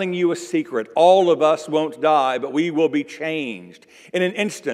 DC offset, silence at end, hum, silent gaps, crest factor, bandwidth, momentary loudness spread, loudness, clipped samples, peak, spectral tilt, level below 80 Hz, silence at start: under 0.1%; 0 s; none; none; 18 dB; 13.5 kHz; 11 LU; -19 LUFS; under 0.1%; -2 dBFS; -5 dB/octave; -76 dBFS; 0 s